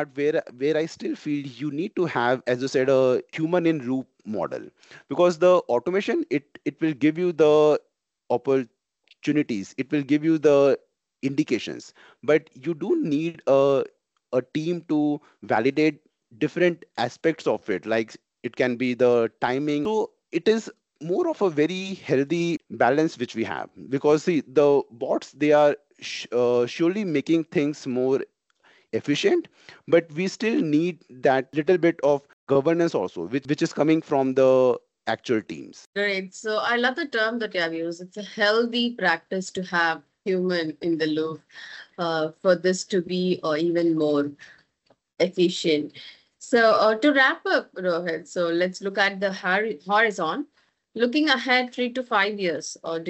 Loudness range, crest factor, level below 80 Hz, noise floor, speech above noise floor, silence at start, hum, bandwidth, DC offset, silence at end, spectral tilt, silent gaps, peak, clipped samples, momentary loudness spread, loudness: 3 LU; 18 dB; -72 dBFS; -66 dBFS; 42 dB; 0 s; none; 8.4 kHz; under 0.1%; 0 s; -5.5 dB/octave; 32.33-32.47 s, 35.86-35.93 s; -6 dBFS; under 0.1%; 11 LU; -24 LUFS